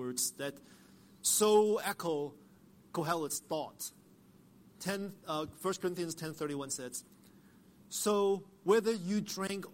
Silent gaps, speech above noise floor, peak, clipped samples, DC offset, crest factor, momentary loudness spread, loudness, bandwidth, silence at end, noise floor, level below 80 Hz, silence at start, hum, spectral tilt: none; 27 dB; -16 dBFS; under 0.1%; under 0.1%; 20 dB; 14 LU; -34 LUFS; 16.5 kHz; 0 s; -61 dBFS; -74 dBFS; 0 s; none; -3.5 dB/octave